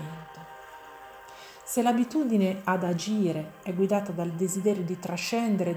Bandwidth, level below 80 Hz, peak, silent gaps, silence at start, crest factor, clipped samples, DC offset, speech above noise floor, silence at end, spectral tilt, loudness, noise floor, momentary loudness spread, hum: over 20 kHz; -68 dBFS; -12 dBFS; none; 0 s; 16 dB; under 0.1%; under 0.1%; 20 dB; 0 s; -5.5 dB/octave; -28 LUFS; -47 dBFS; 20 LU; none